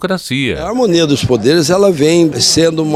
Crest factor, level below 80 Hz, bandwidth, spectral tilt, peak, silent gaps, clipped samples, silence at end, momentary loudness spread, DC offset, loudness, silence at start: 12 dB; -40 dBFS; 15.5 kHz; -4.5 dB/octave; 0 dBFS; none; under 0.1%; 0 s; 6 LU; under 0.1%; -11 LUFS; 0 s